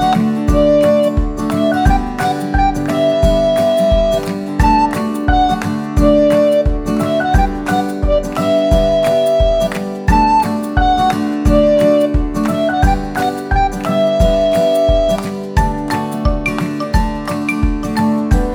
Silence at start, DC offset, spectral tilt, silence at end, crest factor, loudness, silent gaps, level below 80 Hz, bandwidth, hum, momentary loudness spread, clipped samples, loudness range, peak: 0 s; under 0.1%; -6.5 dB/octave; 0 s; 14 dB; -14 LUFS; none; -20 dBFS; 19.5 kHz; none; 7 LU; under 0.1%; 2 LU; 0 dBFS